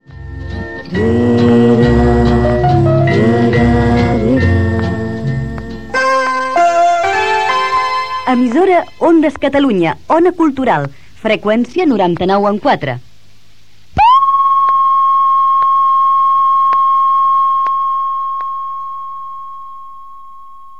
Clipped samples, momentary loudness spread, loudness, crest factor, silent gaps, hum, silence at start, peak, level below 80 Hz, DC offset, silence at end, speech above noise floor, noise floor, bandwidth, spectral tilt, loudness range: under 0.1%; 13 LU; -12 LUFS; 12 dB; none; none; 0 s; 0 dBFS; -30 dBFS; 2%; 0.3 s; 36 dB; -48 dBFS; 9.6 kHz; -7 dB/octave; 4 LU